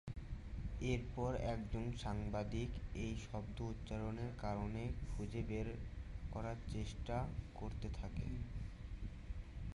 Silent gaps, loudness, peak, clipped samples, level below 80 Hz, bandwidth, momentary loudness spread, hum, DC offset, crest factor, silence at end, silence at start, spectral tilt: none; -46 LUFS; -26 dBFS; under 0.1%; -48 dBFS; 11.5 kHz; 9 LU; none; under 0.1%; 18 dB; 0 s; 0.05 s; -7 dB/octave